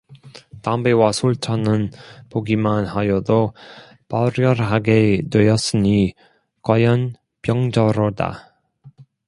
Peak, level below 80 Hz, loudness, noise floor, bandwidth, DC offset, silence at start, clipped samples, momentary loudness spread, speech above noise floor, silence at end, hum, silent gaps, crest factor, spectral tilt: 0 dBFS; -46 dBFS; -19 LUFS; -49 dBFS; 11.5 kHz; under 0.1%; 0.1 s; under 0.1%; 11 LU; 31 dB; 0.4 s; none; none; 18 dB; -6.5 dB/octave